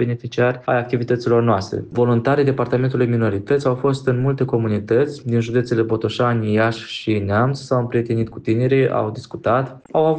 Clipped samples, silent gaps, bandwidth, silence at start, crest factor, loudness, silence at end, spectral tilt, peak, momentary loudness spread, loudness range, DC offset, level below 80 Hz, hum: under 0.1%; none; 8.8 kHz; 0 s; 12 dB; -19 LUFS; 0 s; -7.5 dB/octave; -6 dBFS; 5 LU; 1 LU; under 0.1%; -54 dBFS; none